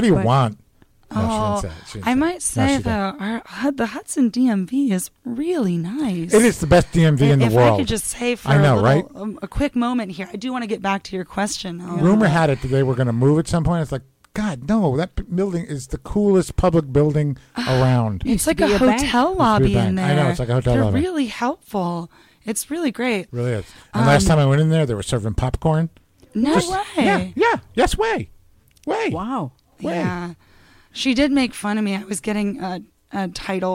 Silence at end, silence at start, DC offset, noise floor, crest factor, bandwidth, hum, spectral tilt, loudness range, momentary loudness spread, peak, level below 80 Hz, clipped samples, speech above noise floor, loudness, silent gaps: 0 s; 0 s; under 0.1%; -54 dBFS; 14 dB; 16 kHz; none; -6 dB/octave; 6 LU; 12 LU; -6 dBFS; -36 dBFS; under 0.1%; 35 dB; -20 LUFS; none